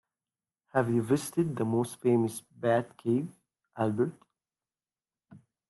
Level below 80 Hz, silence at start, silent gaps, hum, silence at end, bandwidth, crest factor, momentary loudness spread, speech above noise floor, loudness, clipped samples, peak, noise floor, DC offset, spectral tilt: -72 dBFS; 0.75 s; none; none; 0.3 s; 12.5 kHz; 18 dB; 6 LU; over 61 dB; -30 LUFS; under 0.1%; -12 dBFS; under -90 dBFS; under 0.1%; -7 dB/octave